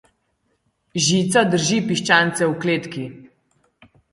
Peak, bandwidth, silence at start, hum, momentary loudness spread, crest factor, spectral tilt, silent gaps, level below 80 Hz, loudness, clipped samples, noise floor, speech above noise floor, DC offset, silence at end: 0 dBFS; 11.5 kHz; 0.95 s; none; 15 LU; 20 dB; -4 dB/octave; none; -60 dBFS; -18 LUFS; under 0.1%; -69 dBFS; 50 dB; under 0.1%; 0.85 s